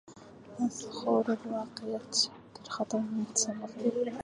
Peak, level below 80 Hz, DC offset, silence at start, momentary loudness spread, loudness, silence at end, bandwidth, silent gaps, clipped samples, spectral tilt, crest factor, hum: -14 dBFS; -72 dBFS; under 0.1%; 0.05 s; 14 LU; -32 LUFS; 0 s; 11.5 kHz; none; under 0.1%; -3 dB/octave; 18 dB; none